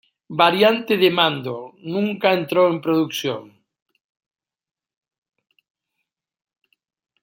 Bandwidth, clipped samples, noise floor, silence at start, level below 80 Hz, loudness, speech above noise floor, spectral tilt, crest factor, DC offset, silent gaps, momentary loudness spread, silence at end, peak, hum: 16.5 kHz; under 0.1%; -80 dBFS; 0.3 s; -70 dBFS; -19 LUFS; 61 dB; -5 dB/octave; 22 dB; under 0.1%; none; 14 LU; 3.75 s; 0 dBFS; none